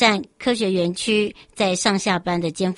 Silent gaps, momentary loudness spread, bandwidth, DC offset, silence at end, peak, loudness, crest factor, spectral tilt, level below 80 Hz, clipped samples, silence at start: none; 5 LU; 11.5 kHz; under 0.1%; 0 s; -2 dBFS; -21 LUFS; 18 dB; -4 dB/octave; -56 dBFS; under 0.1%; 0 s